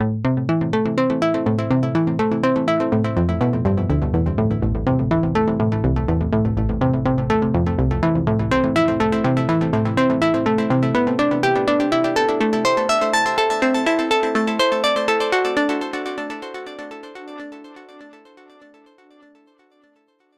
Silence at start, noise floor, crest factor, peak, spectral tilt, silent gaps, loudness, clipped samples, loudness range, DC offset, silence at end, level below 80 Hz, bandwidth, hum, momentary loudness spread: 0 s; -61 dBFS; 14 dB; -6 dBFS; -6.5 dB/octave; none; -19 LUFS; under 0.1%; 6 LU; under 0.1%; 2.25 s; -34 dBFS; 13 kHz; none; 7 LU